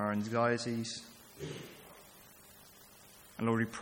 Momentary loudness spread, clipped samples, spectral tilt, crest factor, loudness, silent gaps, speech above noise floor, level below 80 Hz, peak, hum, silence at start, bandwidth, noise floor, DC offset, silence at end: 23 LU; under 0.1%; -5.5 dB/octave; 20 dB; -36 LUFS; none; 23 dB; -72 dBFS; -16 dBFS; none; 0 s; 17 kHz; -58 dBFS; under 0.1%; 0 s